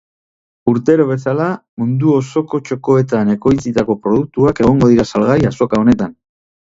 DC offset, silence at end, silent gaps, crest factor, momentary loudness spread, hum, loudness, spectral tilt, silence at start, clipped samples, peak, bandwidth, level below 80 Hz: under 0.1%; 0.55 s; 1.69-1.77 s; 14 dB; 8 LU; none; -14 LUFS; -8 dB/octave; 0.65 s; under 0.1%; 0 dBFS; 7.8 kHz; -40 dBFS